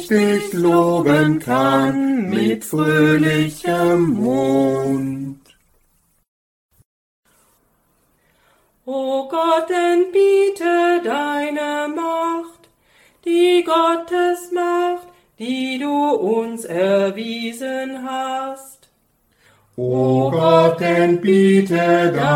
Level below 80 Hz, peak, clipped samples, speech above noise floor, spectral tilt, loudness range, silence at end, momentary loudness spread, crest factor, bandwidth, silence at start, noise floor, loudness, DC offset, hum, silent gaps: -58 dBFS; -2 dBFS; under 0.1%; 45 dB; -6 dB/octave; 8 LU; 0 s; 11 LU; 16 dB; 17 kHz; 0 s; -62 dBFS; -17 LUFS; under 0.1%; none; 6.28-6.69 s, 6.85-7.23 s